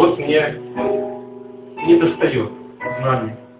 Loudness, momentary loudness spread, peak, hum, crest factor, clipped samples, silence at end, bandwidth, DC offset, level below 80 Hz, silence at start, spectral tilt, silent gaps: -19 LUFS; 19 LU; 0 dBFS; none; 18 dB; under 0.1%; 0.15 s; 4 kHz; under 0.1%; -54 dBFS; 0 s; -11 dB/octave; none